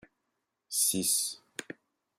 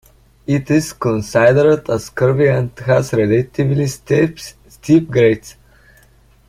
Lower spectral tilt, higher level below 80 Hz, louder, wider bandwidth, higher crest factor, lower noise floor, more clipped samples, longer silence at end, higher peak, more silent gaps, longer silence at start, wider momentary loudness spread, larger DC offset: second, -1 dB/octave vs -7 dB/octave; second, -76 dBFS vs -46 dBFS; second, -28 LUFS vs -15 LUFS; about the same, 16 kHz vs 15.5 kHz; first, 22 dB vs 14 dB; first, -83 dBFS vs -50 dBFS; neither; second, 0.55 s vs 0.95 s; second, -14 dBFS vs 0 dBFS; neither; first, 0.7 s vs 0.5 s; first, 21 LU vs 9 LU; neither